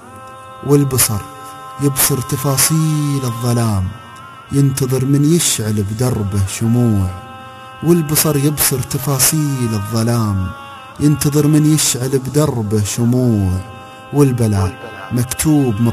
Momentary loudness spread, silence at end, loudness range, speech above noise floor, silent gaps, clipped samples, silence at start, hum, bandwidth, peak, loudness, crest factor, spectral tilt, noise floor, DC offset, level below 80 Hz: 19 LU; 0 s; 2 LU; 20 dB; none; under 0.1%; 0 s; none; 15 kHz; 0 dBFS; -15 LUFS; 16 dB; -5 dB/octave; -34 dBFS; under 0.1%; -36 dBFS